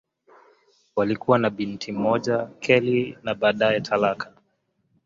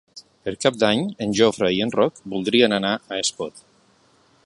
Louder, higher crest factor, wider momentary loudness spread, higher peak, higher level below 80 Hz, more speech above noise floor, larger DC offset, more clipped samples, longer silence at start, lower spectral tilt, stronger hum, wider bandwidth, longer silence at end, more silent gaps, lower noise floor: about the same, -23 LUFS vs -21 LUFS; about the same, 20 dB vs 20 dB; second, 10 LU vs 13 LU; about the same, -4 dBFS vs -2 dBFS; about the same, -62 dBFS vs -58 dBFS; first, 48 dB vs 37 dB; neither; neither; first, 0.95 s vs 0.15 s; first, -6 dB/octave vs -4 dB/octave; neither; second, 7.6 kHz vs 11.5 kHz; about the same, 0.8 s vs 0.85 s; neither; first, -71 dBFS vs -58 dBFS